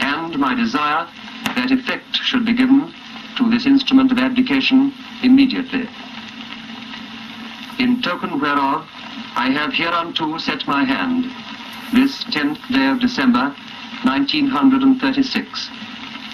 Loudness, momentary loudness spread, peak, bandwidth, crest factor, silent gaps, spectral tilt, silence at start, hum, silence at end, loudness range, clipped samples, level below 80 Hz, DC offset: -17 LUFS; 17 LU; -2 dBFS; 12.5 kHz; 16 dB; none; -4.5 dB/octave; 0 s; none; 0 s; 5 LU; under 0.1%; -54 dBFS; under 0.1%